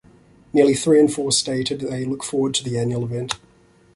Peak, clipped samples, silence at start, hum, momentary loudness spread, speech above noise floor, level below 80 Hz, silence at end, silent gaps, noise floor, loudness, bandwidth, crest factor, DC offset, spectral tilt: -2 dBFS; under 0.1%; 0.55 s; none; 10 LU; 35 dB; -56 dBFS; 0.6 s; none; -54 dBFS; -20 LUFS; 11.5 kHz; 18 dB; under 0.1%; -4.5 dB/octave